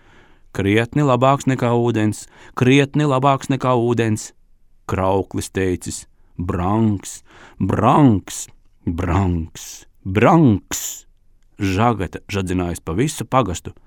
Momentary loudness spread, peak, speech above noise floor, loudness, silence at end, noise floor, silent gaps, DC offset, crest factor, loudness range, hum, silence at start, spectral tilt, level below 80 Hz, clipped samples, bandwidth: 17 LU; 0 dBFS; 33 dB; -18 LUFS; 0.15 s; -51 dBFS; none; under 0.1%; 18 dB; 5 LU; none; 0.55 s; -6 dB/octave; -42 dBFS; under 0.1%; 18.5 kHz